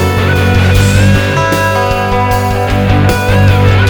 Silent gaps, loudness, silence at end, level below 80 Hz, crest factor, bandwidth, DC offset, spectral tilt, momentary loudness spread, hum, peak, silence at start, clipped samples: none; -10 LUFS; 0 s; -20 dBFS; 8 dB; 19 kHz; under 0.1%; -6 dB/octave; 4 LU; none; 0 dBFS; 0 s; 0.2%